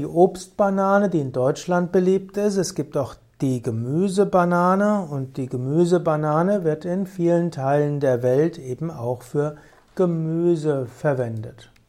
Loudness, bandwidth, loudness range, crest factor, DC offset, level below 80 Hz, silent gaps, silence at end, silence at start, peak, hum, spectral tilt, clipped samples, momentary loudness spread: -22 LUFS; 14 kHz; 3 LU; 18 dB; under 0.1%; -58 dBFS; none; 0.4 s; 0 s; -4 dBFS; none; -7.5 dB/octave; under 0.1%; 10 LU